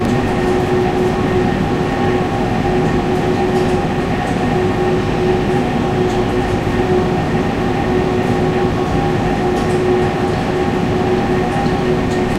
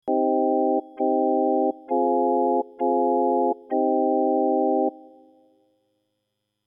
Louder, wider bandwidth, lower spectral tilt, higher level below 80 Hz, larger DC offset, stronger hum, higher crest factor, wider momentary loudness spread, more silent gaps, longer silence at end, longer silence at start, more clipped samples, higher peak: first, -16 LUFS vs -22 LUFS; first, 14 kHz vs 3.3 kHz; second, -7 dB/octave vs -10.5 dB/octave; first, -30 dBFS vs -82 dBFS; neither; neither; about the same, 14 dB vs 12 dB; about the same, 2 LU vs 3 LU; neither; second, 0 s vs 1.7 s; about the same, 0 s vs 0.05 s; neither; first, -2 dBFS vs -10 dBFS